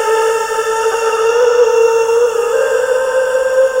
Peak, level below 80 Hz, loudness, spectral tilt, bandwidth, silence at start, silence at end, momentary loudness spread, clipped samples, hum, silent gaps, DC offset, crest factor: -2 dBFS; -52 dBFS; -13 LUFS; -0.5 dB/octave; 16 kHz; 0 s; 0 s; 4 LU; under 0.1%; none; none; under 0.1%; 12 dB